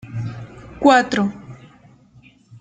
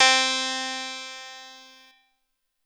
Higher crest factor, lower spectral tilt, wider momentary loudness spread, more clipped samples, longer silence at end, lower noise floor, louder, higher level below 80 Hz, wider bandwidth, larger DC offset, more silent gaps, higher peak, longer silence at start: about the same, 20 dB vs 18 dB; first, -5.5 dB/octave vs 3 dB/octave; about the same, 24 LU vs 24 LU; neither; about the same, 1.05 s vs 1.05 s; second, -50 dBFS vs -76 dBFS; first, -17 LUFS vs -24 LUFS; first, -52 dBFS vs -84 dBFS; second, 9.2 kHz vs over 20 kHz; neither; neither; first, -2 dBFS vs -8 dBFS; about the same, 0.05 s vs 0 s